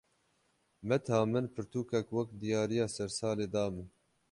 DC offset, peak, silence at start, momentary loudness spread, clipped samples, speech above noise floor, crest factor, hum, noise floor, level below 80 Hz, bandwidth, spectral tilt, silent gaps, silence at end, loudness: under 0.1%; -16 dBFS; 0.8 s; 8 LU; under 0.1%; 41 dB; 20 dB; none; -75 dBFS; -64 dBFS; 11.5 kHz; -6 dB/octave; none; 0.45 s; -34 LUFS